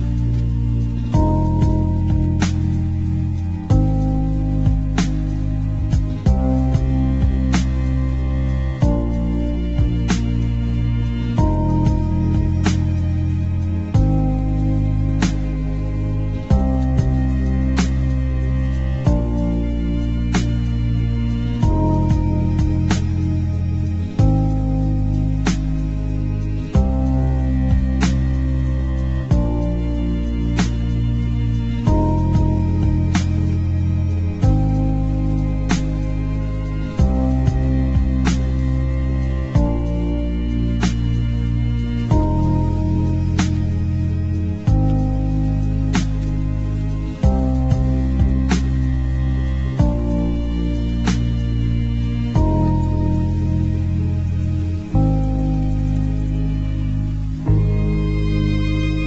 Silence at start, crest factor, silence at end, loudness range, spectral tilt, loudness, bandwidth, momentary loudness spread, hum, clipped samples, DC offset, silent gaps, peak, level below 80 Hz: 0 s; 14 dB; 0 s; 1 LU; -7.5 dB/octave; -20 LUFS; 8 kHz; 4 LU; none; under 0.1%; under 0.1%; none; -2 dBFS; -22 dBFS